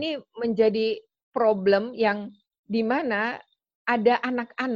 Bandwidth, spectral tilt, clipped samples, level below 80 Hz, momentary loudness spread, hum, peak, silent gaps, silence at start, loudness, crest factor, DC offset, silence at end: 7 kHz; -7 dB/octave; under 0.1%; -68 dBFS; 11 LU; none; -8 dBFS; 1.23-1.32 s, 2.59-2.64 s, 3.75-3.85 s; 0 s; -25 LUFS; 18 dB; under 0.1%; 0 s